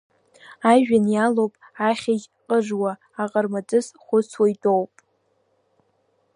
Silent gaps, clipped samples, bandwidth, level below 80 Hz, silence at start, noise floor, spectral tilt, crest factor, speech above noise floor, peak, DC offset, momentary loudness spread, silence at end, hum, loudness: none; under 0.1%; 11 kHz; -70 dBFS; 0.5 s; -67 dBFS; -6 dB/octave; 20 dB; 47 dB; -4 dBFS; under 0.1%; 9 LU; 1.5 s; none; -22 LUFS